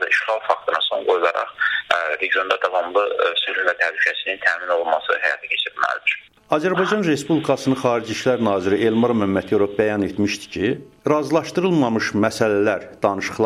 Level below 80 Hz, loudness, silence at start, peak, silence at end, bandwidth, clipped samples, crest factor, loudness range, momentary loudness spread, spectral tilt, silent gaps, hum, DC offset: -60 dBFS; -20 LUFS; 0 s; -2 dBFS; 0 s; 14.5 kHz; under 0.1%; 18 dB; 1 LU; 3 LU; -5 dB/octave; none; none; under 0.1%